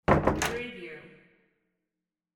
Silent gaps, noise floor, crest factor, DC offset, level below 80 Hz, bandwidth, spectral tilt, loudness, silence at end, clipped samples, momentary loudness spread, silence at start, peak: none; -88 dBFS; 24 dB; under 0.1%; -44 dBFS; 16 kHz; -5 dB/octave; -28 LUFS; 1.3 s; under 0.1%; 20 LU; 0.1 s; -6 dBFS